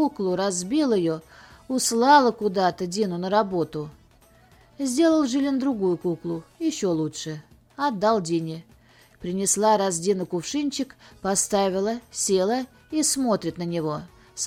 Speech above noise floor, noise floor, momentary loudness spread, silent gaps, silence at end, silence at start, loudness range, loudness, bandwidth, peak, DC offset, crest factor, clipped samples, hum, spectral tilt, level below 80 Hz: 32 dB; -55 dBFS; 12 LU; none; 0 s; 0 s; 4 LU; -24 LUFS; 17.5 kHz; -4 dBFS; under 0.1%; 20 dB; under 0.1%; none; -4 dB/octave; -60 dBFS